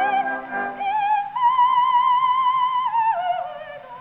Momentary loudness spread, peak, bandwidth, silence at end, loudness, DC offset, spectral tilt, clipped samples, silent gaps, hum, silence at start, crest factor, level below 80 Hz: 11 LU; -10 dBFS; 3.9 kHz; 0 s; -20 LUFS; under 0.1%; -5.5 dB/octave; under 0.1%; none; none; 0 s; 12 dB; -64 dBFS